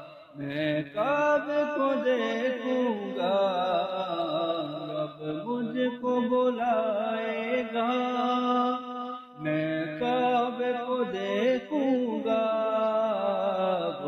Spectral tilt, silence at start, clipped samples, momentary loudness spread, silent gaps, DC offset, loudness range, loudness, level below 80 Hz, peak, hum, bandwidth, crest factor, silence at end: -6.5 dB/octave; 0 s; under 0.1%; 7 LU; none; under 0.1%; 2 LU; -28 LUFS; -74 dBFS; -16 dBFS; none; 6.8 kHz; 12 dB; 0 s